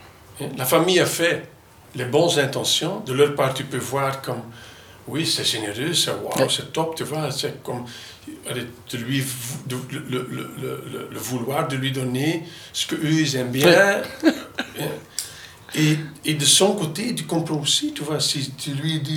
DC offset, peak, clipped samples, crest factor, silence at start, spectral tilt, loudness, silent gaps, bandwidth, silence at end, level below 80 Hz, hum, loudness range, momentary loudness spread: under 0.1%; 0 dBFS; under 0.1%; 22 dB; 0 s; -3.5 dB/octave; -22 LUFS; none; 19.5 kHz; 0 s; -60 dBFS; none; 8 LU; 14 LU